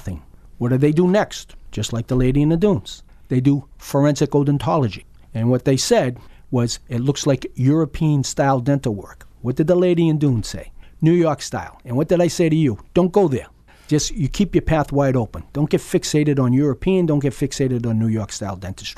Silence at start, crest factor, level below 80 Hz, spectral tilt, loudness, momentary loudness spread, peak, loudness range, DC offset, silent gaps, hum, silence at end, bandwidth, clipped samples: 0 s; 16 dB; -38 dBFS; -6.5 dB/octave; -19 LUFS; 11 LU; -2 dBFS; 1 LU; under 0.1%; none; none; 0.05 s; 14 kHz; under 0.1%